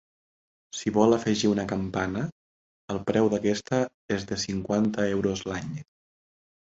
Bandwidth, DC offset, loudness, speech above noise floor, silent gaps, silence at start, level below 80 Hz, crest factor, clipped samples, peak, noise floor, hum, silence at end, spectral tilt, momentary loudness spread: 8 kHz; under 0.1%; -27 LUFS; over 64 dB; 2.32-2.88 s, 3.94-4.09 s; 0.75 s; -54 dBFS; 22 dB; under 0.1%; -6 dBFS; under -90 dBFS; none; 0.85 s; -5.5 dB/octave; 12 LU